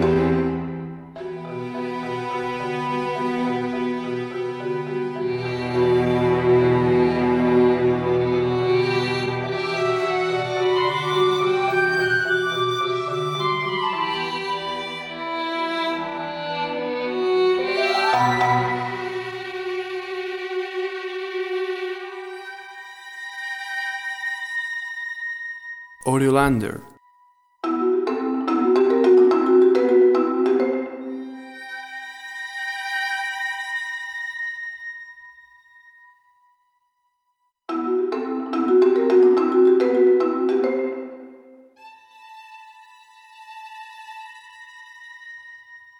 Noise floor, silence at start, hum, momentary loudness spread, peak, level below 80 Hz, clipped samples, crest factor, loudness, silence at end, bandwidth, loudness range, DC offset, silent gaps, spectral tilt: -72 dBFS; 0 s; none; 19 LU; -4 dBFS; -52 dBFS; under 0.1%; 18 dB; -22 LUFS; 0.2 s; 12 kHz; 12 LU; under 0.1%; none; -6 dB/octave